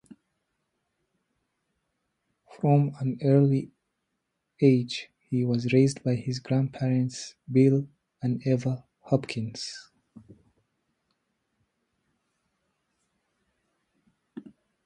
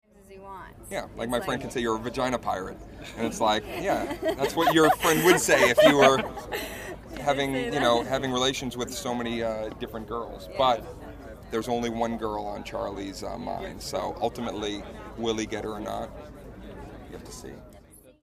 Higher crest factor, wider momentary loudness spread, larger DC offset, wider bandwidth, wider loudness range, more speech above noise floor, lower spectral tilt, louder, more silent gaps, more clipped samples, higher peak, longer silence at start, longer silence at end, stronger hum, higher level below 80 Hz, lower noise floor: about the same, 20 dB vs 24 dB; second, 15 LU vs 22 LU; neither; second, 10.5 kHz vs 15.5 kHz; about the same, 9 LU vs 11 LU; first, 56 dB vs 25 dB; first, -7.5 dB/octave vs -4 dB/octave; about the same, -26 LUFS vs -26 LUFS; neither; neither; second, -8 dBFS vs -4 dBFS; first, 2.55 s vs 0.3 s; first, 0.45 s vs 0.1 s; neither; second, -68 dBFS vs -48 dBFS; first, -80 dBFS vs -52 dBFS